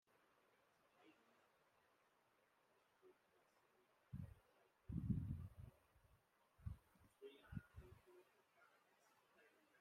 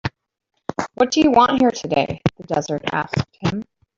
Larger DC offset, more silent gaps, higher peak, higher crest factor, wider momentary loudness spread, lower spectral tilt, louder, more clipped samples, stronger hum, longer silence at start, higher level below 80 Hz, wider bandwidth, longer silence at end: neither; neither; second, -30 dBFS vs -2 dBFS; first, 28 dB vs 18 dB; first, 19 LU vs 15 LU; first, -8.5 dB/octave vs -5.5 dB/octave; second, -54 LUFS vs -19 LUFS; neither; neither; first, 1 s vs 0.05 s; second, -68 dBFS vs -48 dBFS; first, 15.5 kHz vs 7.6 kHz; about the same, 0.35 s vs 0.35 s